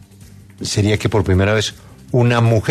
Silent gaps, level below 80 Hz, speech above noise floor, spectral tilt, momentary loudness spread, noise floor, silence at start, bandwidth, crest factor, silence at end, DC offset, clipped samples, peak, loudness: none; -40 dBFS; 26 dB; -5.5 dB/octave; 8 LU; -41 dBFS; 0.6 s; 13.5 kHz; 16 dB; 0 s; under 0.1%; under 0.1%; -2 dBFS; -16 LUFS